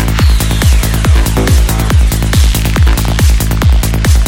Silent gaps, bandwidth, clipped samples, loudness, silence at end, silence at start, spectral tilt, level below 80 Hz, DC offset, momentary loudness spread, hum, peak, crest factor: none; 17 kHz; under 0.1%; -10 LUFS; 0 s; 0 s; -5 dB/octave; -10 dBFS; under 0.1%; 1 LU; none; 0 dBFS; 8 dB